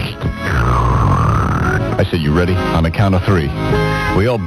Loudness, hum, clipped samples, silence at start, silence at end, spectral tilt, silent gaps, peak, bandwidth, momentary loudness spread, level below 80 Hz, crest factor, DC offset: -15 LUFS; none; under 0.1%; 0 s; 0 s; -7 dB/octave; none; -2 dBFS; 14 kHz; 3 LU; -24 dBFS; 12 dB; under 0.1%